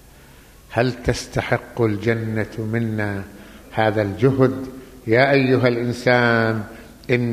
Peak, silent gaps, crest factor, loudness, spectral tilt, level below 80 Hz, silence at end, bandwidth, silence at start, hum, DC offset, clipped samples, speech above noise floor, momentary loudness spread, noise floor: -2 dBFS; none; 18 dB; -20 LUFS; -6.5 dB/octave; -44 dBFS; 0 s; 15 kHz; 0.7 s; none; under 0.1%; under 0.1%; 27 dB; 14 LU; -46 dBFS